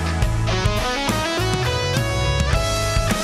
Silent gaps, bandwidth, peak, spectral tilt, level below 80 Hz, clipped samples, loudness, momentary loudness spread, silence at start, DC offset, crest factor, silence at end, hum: none; 16 kHz; -6 dBFS; -4.5 dB/octave; -26 dBFS; under 0.1%; -20 LUFS; 1 LU; 0 s; under 0.1%; 14 dB; 0 s; none